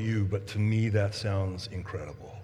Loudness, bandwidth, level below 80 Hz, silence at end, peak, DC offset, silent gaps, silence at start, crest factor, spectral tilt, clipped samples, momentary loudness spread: -30 LUFS; 11 kHz; -54 dBFS; 0 s; -14 dBFS; under 0.1%; none; 0 s; 16 dB; -7 dB/octave; under 0.1%; 12 LU